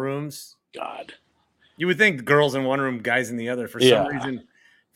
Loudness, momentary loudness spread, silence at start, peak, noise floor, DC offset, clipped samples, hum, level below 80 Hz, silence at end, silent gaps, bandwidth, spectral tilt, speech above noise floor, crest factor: -21 LUFS; 18 LU; 0 s; -2 dBFS; -63 dBFS; under 0.1%; under 0.1%; none; -64 dBFS; 0.55 s; none; 16.5 kHz; -4.5 dB/octave; 41 dB; 22 dB